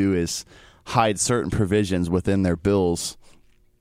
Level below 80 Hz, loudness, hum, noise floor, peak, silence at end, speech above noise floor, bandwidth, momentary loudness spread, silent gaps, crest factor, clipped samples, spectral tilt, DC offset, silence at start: -44 dBFS; -22 LUFS; none; -54 dBFS; -6 dBFS; 0.65 s; 32 dB; 16 kHz; 7 LU; none; 18 dB; under 0.1%; -5 dB/octave; under 0.1%; 0 s